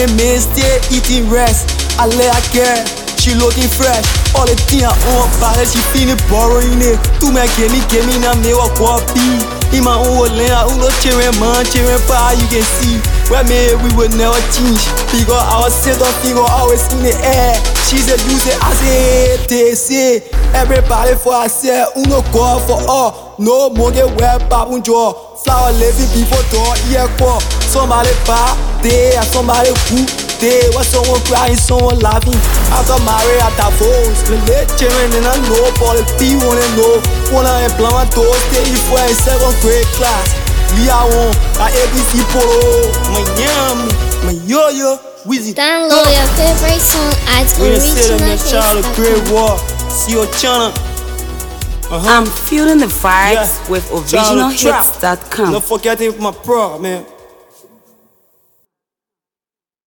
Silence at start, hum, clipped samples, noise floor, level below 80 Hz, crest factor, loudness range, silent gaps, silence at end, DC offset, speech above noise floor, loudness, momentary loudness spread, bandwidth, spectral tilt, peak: 0 s; none; under 0.1%; under -90 dBFS; -16 dBFS; 10 dB; 2 LU; none; 2.8 s; under 0.1%; over 80 dB; -11 LUFS; 5 LU; 19.5 kHz; -4 dB/octave; 0 dBFS